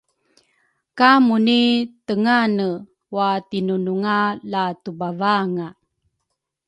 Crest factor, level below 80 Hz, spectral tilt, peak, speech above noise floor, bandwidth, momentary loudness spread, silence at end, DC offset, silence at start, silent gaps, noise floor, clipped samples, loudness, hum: 20 dB; -68 dBFS; -6.5 dB/octave; 0 dBFS; 59 dB; 8.8 kHz; 13 LU; 0.95 s; under 0.1%; 0.95 s; none; -77 dBFS; under 0.1%; -19 LUFS; none